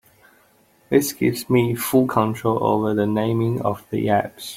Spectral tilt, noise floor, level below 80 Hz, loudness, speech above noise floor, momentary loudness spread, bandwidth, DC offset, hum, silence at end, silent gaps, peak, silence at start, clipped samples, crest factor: -6 dB/octave; -57 dBFS; -56 dBFS; -21 LUFS; 37 dB; 4 LU; 16.5 kHz; under 0.1%; none; 0 s; none; -4 dBFS; 0.9 s; under 0.1%; 18 dB